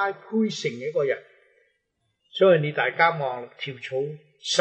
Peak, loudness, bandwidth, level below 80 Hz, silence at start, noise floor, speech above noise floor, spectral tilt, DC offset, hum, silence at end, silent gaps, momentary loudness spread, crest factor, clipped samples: -4 dBFS; -24 LUFS; 9.6 kHz; -82 dBFS; 0 s; -75 dBFS; 51 dB; -4.5 dB/octave; under 0.1%; none; 0 s; none; 15 LU; 22 dB; under 0.1%